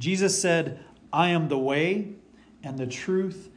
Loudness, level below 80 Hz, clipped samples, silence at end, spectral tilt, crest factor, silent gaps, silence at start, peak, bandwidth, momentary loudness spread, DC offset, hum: -25 LUFS; -66 dBFS; under 0.1%; 0.05 s; -4.5 dB/octave; 18 dB; none; 0 s; -8 dBFS; 10.5 kHz; 15 LU; under 0.1%; none